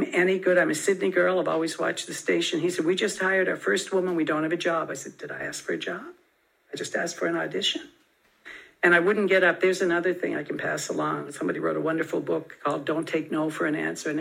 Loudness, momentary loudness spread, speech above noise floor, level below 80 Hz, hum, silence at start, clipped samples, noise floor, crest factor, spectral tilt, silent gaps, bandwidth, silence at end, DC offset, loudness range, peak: -25 LUFS; 12 LU; 40 dB; -76 dBFS; none; 0 s; under 0.1%; -66 dBFS; 20 dB; -4 dB/octave; none; 16 kHz; 0 s; under 0.1%; 6 LU; -6 dBFS